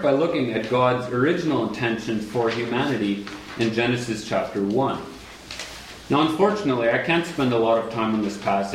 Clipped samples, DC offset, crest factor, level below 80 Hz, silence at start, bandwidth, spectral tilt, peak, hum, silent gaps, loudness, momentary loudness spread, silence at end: under 0.1%; under 0.1%; 16 dB; -54 dBFS; 0 s; 15.5 kHz; -6 dB/octave; -6 dBFS; none; none; -23 LUFS; 13 LU; 0 s